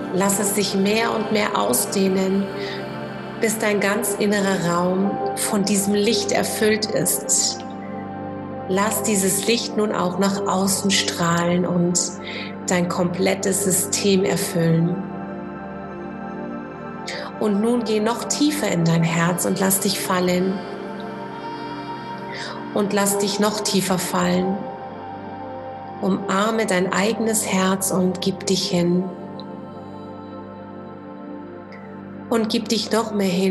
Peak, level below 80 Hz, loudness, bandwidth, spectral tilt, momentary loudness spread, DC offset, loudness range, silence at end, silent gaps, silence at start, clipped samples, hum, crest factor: -4 dBFS; -56 dBFS; -21 LUFS; 13.5 kHz; -4 dB/octave; 15 LU; under 0.1%; 6 LU; 0 s; none; 0 s; under 0.1%; none; 18 dB